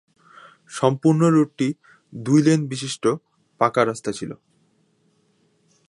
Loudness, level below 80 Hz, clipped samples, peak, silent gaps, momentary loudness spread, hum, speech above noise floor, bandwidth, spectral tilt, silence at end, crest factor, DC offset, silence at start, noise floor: -21 LUFS; -68 dBFS; under 0.1%; -2 dBFS; none; 18 LU; none; 44 dB; 11.5 kHz; -6.5 dB/octave; 1.55 s; 20 dB; under 0.1%; 0.7 s; -64 dBFS